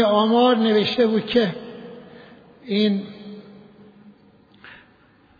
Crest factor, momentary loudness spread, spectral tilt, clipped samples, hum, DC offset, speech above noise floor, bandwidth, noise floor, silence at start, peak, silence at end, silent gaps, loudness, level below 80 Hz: 16 dB; 23 LU; -7.5 dB/octave; under 0.1%; none; under 0.1%; 36 dB; 5 kHz; -55 dBFS; 0 s; -6 dBFS; 0.7 s; none; -19 LUFS; -62 dBFS